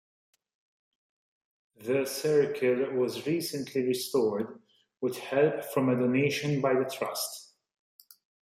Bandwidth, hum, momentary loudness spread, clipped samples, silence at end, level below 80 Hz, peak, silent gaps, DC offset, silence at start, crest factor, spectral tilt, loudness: 16 kHz; none; 9 LU; under 0.1%; 1 s; -76 dBFS; -12 dBFS; none; under 0.1%; 1.8 s; 18 dB; -5 dB/octave; -29 LUFS